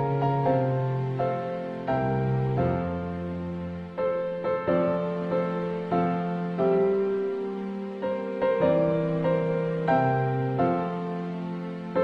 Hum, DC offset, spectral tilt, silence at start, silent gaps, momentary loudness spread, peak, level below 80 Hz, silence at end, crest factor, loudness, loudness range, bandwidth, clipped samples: none; under 0.1%; -10 dB/octave; 0 s; none; 9 LU; -12 dBFS; -54 dBFS; 0 s; 16 dB; -27 LUFS; 3 LU; 5.8 kHz; under 0.1%